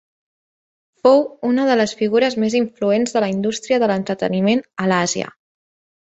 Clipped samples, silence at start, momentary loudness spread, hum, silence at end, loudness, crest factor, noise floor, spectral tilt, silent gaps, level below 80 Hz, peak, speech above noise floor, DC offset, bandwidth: under 0.1%; 1.05 s; 6 LU; none; 0.75 s; -18 LUFS; 16 dB; under -90 dBFS; -5 dB/octave; none; -62 dBFS; -2 dBFS; over 73 dB; under 0.1%; 8.2 kHz